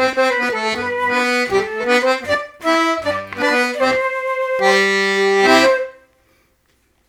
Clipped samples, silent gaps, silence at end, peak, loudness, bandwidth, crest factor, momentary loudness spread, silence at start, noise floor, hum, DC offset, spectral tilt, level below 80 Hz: under 0.1%; none; 1.15 s; 0 dBFS; -16 LUFS; 16.5 kHz; 18 dB; 7 LU; 0 s; -60 dBFS; none; under 0.1%; -3 dB/octave; -54 dBFS